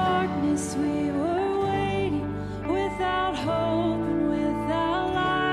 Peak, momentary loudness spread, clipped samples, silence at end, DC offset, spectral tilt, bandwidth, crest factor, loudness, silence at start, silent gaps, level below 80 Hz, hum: -12 dBFS; 3 LU; under 0.1%; 0 s; under 0.1%; -6 dB/octave; 12.5 kHz; 14 dB; -26 LUFS; 0 s; none; -46 dBFS; none